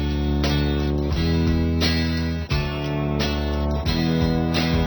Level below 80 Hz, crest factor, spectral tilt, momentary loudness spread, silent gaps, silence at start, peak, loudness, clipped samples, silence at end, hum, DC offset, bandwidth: -28 dBFS; 14 dB; -6.5 dB/octave; 4 LU; none; 0 s; -8 dBFS; -22 LUFS; under 0.1%; 0 s; none; under 0.1%; over 20 kHz